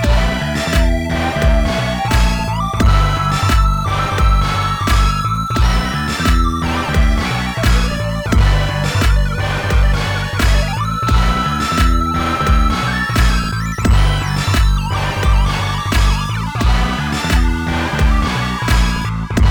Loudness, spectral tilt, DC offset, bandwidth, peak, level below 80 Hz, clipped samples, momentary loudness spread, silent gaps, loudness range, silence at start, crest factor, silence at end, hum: -16 LUFS; -5 dB/octave; under 0.1%; 19 kHz; -2 dBFS; -16 dBFS; under 0.1%; 4 LU; none; 1 LU; 0 s; 12 dB; 0 s; none